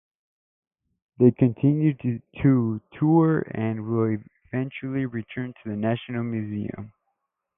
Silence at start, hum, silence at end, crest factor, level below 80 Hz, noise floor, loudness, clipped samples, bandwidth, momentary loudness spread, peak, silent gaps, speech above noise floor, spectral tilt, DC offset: 1.2 s; none; 0.7 s; 20 dB; -58 dBFS; -78 dBFS; -24 LUFS; under 0.1%; 3.7 kHz; 13 LU; -4 dBFS; none; 55 dB; -13 dB/octave; under 0.1%